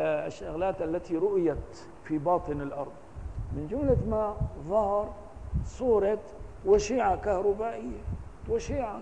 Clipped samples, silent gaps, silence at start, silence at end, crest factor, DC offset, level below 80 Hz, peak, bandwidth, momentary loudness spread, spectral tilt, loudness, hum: under 0.1%; none; 0 s; 0 s; 18 dB; 0.3%; -42 dBFS; -12 dBFS; 9.8 kHz; 14 LU; -7 dB/octave; -30 LUFS; none